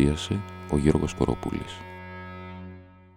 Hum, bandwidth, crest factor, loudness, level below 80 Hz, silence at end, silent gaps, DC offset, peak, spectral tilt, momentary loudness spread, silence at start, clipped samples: none; 15.5 kHz; 20 dB; -27 LUFS; -40 dBFS; 0.1 s; none; under 0.1%; -6 dBFS; -6.5 dB/octave; 18 LU; 0 s; under 0.1%